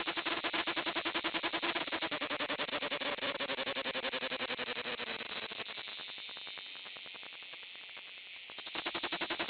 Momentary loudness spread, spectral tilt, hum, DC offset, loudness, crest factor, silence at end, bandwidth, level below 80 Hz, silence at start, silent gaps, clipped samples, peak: 12 LU; -5.5 dB/octave; none; under 0.1%; -37 LUFS; 20 dB; 0 s; 5.2 kHz; -74 dBFS; 0 s; none; under 0.1%; -18 dBFS